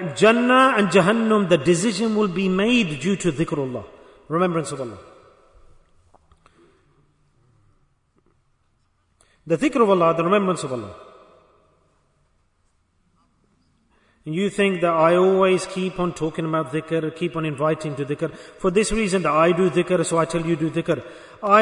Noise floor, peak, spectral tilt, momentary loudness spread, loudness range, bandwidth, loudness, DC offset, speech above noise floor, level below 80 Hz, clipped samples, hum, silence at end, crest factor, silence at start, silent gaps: -65 dBFS; -4 dBFS; -5.5 dB/octave; 11 LU; 10 LU; 11 kHz; -20 LUFS; under 0.1%; 45 dB; -50 dBFS; under 0.1%; none; 0 s; 18 dB; 0 s; none